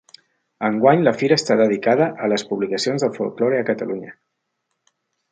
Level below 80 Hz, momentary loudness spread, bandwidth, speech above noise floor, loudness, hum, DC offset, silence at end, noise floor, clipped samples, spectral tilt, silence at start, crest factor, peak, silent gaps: -68 dBFS; 9 LU; 9.4 kHz; 57 dB; -19 LUFS; none; under 0.1%; 1.2 s; -75 dBFS; under 0.1%; -5.5 dB/octave; 0.6 s; 18 dB; -2 dBFS; none